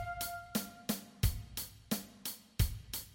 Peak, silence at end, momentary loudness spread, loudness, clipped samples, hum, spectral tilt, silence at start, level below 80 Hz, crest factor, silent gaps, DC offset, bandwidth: -18 dBFS; 0 s; 7 LU; -39 LUFS; under 0.1%; none; -4 dB/octave; 0 s; -44 dBFS; 22 dB; none; under 0.1%; 17 kHz